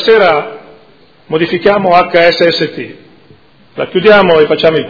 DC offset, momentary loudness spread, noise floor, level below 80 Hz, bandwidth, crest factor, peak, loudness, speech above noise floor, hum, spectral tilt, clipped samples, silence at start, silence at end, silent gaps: under 0.1%; 14 LU; -44 dBFS; -46 dBFS; 5.4 kHz; 10 dB; 0 dBFS; -9 LUFS; 35 dB; none; -6.5 dB/octave; 1%; 0 s; 0 s; none